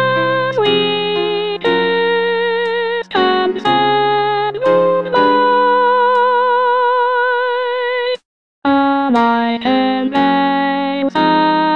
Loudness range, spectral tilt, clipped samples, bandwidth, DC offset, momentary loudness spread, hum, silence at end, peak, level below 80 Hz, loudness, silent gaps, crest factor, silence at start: 2 LU; -6.5 dB/octave; under 0.1%; 7.2 kHz; 0.4%; 5 LU; none; 0 s; 0 dBFS; -56 dBFS; -14 LUFS; 8.25-8.62 s; 14 dB; 0 s